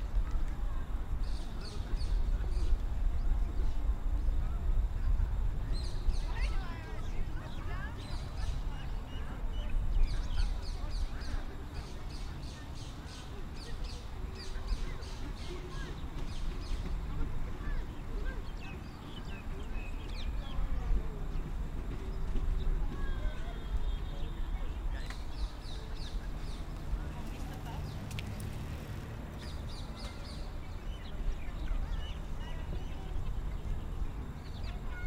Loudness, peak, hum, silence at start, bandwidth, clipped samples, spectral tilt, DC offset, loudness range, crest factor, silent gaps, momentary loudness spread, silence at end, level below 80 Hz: -41 LUFS; -18 dBFS; none; 0 s; 11.5 kHz; under 0.1%; -6 dB/octave; under 0.1%; 6 LU; 18 dB; none; 8 LU; 0 s; -36 dBFS